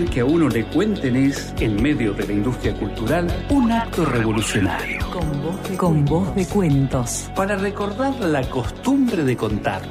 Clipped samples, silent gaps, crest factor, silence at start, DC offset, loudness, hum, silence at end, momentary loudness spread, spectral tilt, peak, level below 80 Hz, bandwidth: under 0.1%; none; 14 dB; 0 s; under 0.1%; -21 LUFS; none; 0 s; 6 LU; -6 dB/octave; -6 dBFS; -34 dBFS; 15.5 kHz